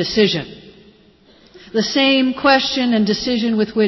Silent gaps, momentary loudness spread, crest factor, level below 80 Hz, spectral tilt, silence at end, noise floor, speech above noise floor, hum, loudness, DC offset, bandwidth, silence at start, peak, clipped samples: none; 9 LU; 14 dB; -50 dBFS; -4.5 dB/octave; 0 s; -50 dBFS; 34 dB; none; -16 LUFS; under 0.1%; 6.2 kHz; 0 s; -4 dBFS; under 0.1%